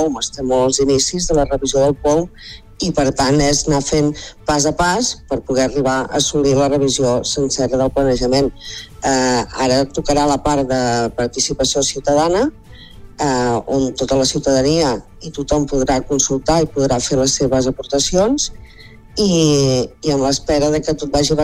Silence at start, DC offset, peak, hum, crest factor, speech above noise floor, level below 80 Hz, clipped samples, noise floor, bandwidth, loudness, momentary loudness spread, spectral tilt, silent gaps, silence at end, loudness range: 0 s; under 0.1%; -2 dBFS; none; 14 dB; 21 dB; -34 dBFS; under 0.1%; -37 dBFS; 15.5 kHz; -16 LUFS; 5 LU; -4 dB/octave; none; 0 s; 1 LU